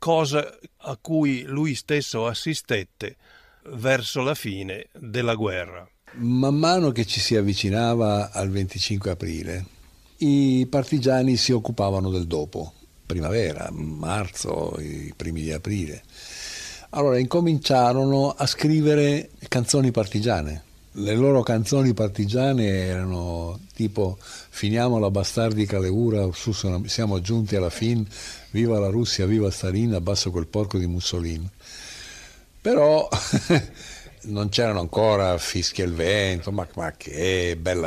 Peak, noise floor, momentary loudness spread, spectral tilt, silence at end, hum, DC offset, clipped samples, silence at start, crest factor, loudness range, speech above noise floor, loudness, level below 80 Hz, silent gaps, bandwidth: -6 dBFS; -46 dBFS; 15 LU; -5.5 dB/octave; 0 s; none; under 0.1%; under 0.1%; 0 s; 16 dB; 5 LU; 23 dB; -23 LUFS; -48 dBFS; none; 15 kHz